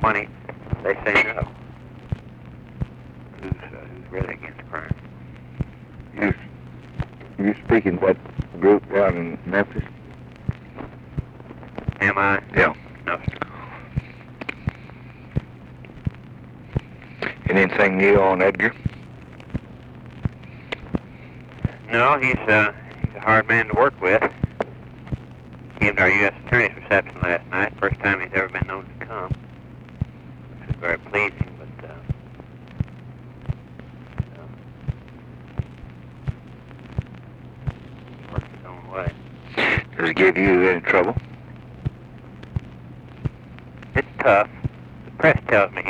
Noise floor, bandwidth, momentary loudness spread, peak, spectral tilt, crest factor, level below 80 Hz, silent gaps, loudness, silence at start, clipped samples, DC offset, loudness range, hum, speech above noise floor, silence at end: -41 dBFS; 9.4 kHz; 24 LU; -4 dBFS; -7.5 dB/octave; 20 dB; -42 dBFS; none; -22 LUFS; 0 s; under 0.1%; under 0.1%; 14 LU; none; 22 dB; 0 s